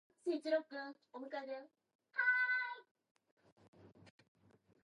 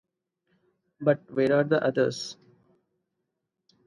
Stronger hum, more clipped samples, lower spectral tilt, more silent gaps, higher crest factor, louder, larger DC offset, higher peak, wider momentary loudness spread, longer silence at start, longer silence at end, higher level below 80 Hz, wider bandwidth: neither; neither; second, -4.5 dB/octave vs -6 dB/octave; first, 1.95-1.99 s, 2.91-2.95 s, 3.11-3.15 s, 3.31-3.37 s, 3.52-3.56 s, 3.68-3.73 s vs none; about the same, 20 dB vs 20 dB; second, -39 LUFS vs -26 LUFS; neither; second, -24 dBFS vs -8 dBFS; first, 17 LU vs 10 LU; second, 0.25 s vs 1 s; second, 0.75 s vs 1.55 s; second, under -90 dBFS vs -72 dBFS; about the same, 11 kHz vs 11.5 kHz